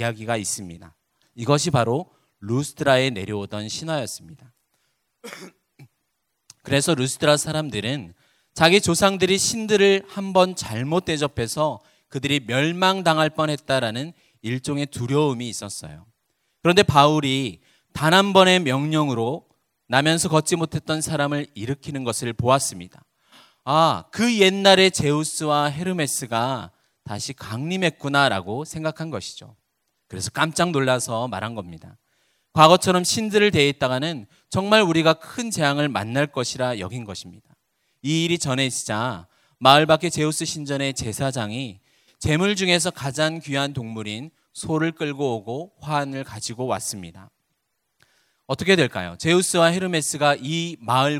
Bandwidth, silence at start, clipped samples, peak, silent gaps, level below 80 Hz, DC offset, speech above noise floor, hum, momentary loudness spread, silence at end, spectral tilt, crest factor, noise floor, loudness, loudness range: 16 kHz; 0 s; under 0.1%; 0 dBFS; none; -52 dBFS; under 0.1%; 54 dB; none; 15 LU; 0 s; -4 dB/octave; 22 dB; -75 dBFS; -21 LUFS; 7 LU